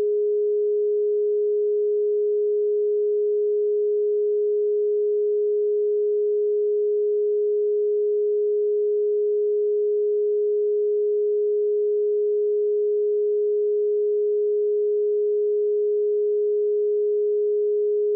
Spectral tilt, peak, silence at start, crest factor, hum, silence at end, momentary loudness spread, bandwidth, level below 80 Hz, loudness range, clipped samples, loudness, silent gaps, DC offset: -12 dB/octave; -18 dBFS; 0 s; 4 dB; none; 0 s; 0 LU; 0.5 kHz; under -90 dBFS; 0 LU; under 0.1%; -22 LUFS; none; under 0.1%